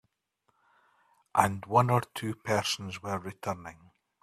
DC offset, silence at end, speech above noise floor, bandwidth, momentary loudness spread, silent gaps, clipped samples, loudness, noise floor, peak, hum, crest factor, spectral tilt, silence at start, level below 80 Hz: under 0.1%; 0.5 s; 47 dB; 15 kHz; 12 LU; none; under 0.1%; -30 LUFS; -76 dBFS; -4 dBFS; none; 26 dB; -5 dB/octave; 1.35 s; -66 dBFS